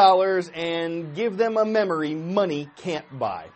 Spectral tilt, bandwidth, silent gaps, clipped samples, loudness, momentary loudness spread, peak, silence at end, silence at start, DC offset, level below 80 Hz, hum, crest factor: -6 dB/octave; 8.4 kHz; none; under 0.1%; -24 LUFS; 9 LU; -4 dBFS; 0.05 s; 0 s; under 0.1%; -68 dBFS; none; 18 dB